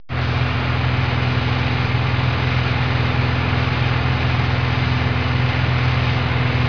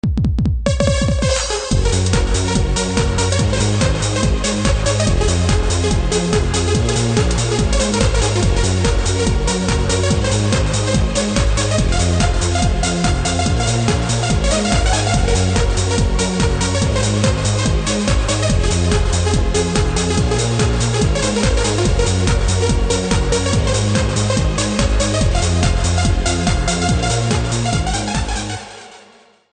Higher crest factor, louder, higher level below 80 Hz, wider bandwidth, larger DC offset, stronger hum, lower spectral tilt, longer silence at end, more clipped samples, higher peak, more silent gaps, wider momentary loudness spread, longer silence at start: about the same, 12 dB vs 16 dB; about the same, -19 LUFS vs -17 LUFS; second, -30 dBFS vs -20 dBFS; second, 5.4 kHz vs 9.6 kHz; first, 2% vs under 0.1%; neither; first, -7 dB/octave vs -4.5 dB/octave; second, 0 s vs 0.55 s; neither; second, -6 dBFS vs 0 dBFS; neither; about the same, 1 LU vs 2 LU; about the same, 0.1 s vs 0.05 s